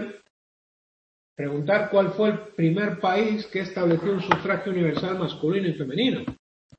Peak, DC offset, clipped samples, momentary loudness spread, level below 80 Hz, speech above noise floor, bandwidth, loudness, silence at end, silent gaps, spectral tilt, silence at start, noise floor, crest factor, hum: -2 dBFS; under 0.1%; under 0.1%; 7 LU; -62 dBFS; over 66 dB; 8 kHz; -24 LUFS; 0.45 s; 0.30-1.36 s; -7.5 dB/octave; 0 s; under -90 dBFS; 24 dB; none